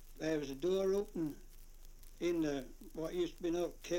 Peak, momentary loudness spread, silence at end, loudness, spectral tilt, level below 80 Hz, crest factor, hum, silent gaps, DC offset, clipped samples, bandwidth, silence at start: -24 dBFS; 9 LU; 0 s; -38 LUFS; -5.5 dB/octave; -54 dBFS; 14 dB; none; none; under 0.1%; under 0.1%; 17 kHz; 0 s